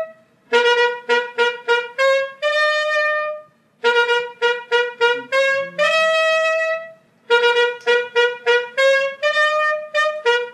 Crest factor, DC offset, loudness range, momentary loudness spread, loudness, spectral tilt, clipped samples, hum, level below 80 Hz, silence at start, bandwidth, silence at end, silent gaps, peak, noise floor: 16 dB; under 0.1%; 1 LU; 5 LU; -17 LUFS; -0.5 dB/octave; under 0.1%; none; -84 dBFS; 0 s; 11.5 kHz; 0 s; none; -4 dBFS; -40 dBFS